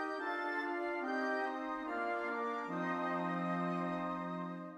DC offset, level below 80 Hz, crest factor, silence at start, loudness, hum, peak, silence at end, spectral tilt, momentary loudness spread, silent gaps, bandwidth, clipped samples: under 0.1%; -76 dBFS; 14 dB; 0 s; -38 LUFS; none; -24 dBFS; 0 s; -7 dB/octave; 3 LU; none; 11 kHz; under 0.1%